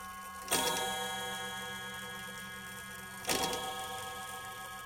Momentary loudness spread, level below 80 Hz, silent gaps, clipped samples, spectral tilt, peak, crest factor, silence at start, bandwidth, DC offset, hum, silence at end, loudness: 12 LU; -64 dBFS; none; under 0.1%; -1.5 dB/octave; -14 dBFS; 24 dB; 0 s; 17 kHz; under 0.1%; none; 0 s; -37 LUFS